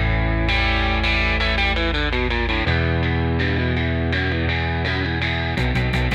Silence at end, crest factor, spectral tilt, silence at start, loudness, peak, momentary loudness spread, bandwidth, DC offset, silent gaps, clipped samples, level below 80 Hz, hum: 0 s; 12 dB; -6.5 dB/octave; 0 s; -20 LUFS; -8 dBFS; 3 LU; 9 kHz; under 0.1%; none; under 0.1%; -26 dBFS; none